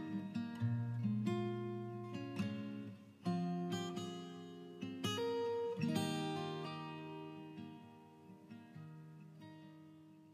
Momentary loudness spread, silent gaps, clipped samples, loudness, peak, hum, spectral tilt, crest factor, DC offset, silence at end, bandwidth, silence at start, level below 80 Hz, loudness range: 18 LU; none; under 0.1%; -42 LUFS; -24 dBFS; none; -6.5 dB/octave; 18 dB; under 0.1%; 0 s; 15 kHz; 0 s; -86 dBFS; 10 LU